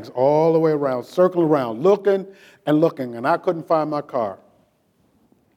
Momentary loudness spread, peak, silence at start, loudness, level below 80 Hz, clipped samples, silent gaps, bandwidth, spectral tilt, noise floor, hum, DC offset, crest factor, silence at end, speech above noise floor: 9 LU; -4 dBFS; 0 s; -20 LUFS; -74 dBFS; under 0.1%; none; 15.5 kHz; -8 dB/octave; -63 dBFS; none; under 0.1%; 16 dB; 1.2 s; 43 dB